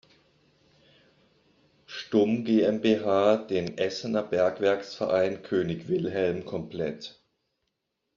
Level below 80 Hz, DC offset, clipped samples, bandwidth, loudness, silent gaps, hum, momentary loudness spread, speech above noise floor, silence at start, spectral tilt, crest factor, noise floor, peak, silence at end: -66 dBFS; under 0.1%; under 0.1%; 7.4 kHz; -27 LUFS; none; none; 11 LU; 54 dB; 1.9 s; -5 dB/octave; 20 dB; -80 dBFS; -8 dBFS; 1.05 s